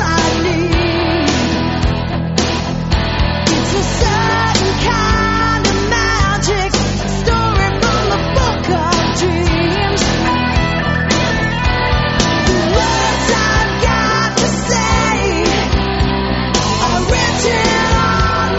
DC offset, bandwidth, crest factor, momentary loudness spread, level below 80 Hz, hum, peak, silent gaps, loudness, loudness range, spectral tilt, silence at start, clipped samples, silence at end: under 0.1%; 8.2 kHz; 14 dB; 3 LU; -22 dBFS; none; 0 dBFS; none; -14 LUFS; 2 LU; -4.5 dB/octave; 0 s; under 0.1%; 0 s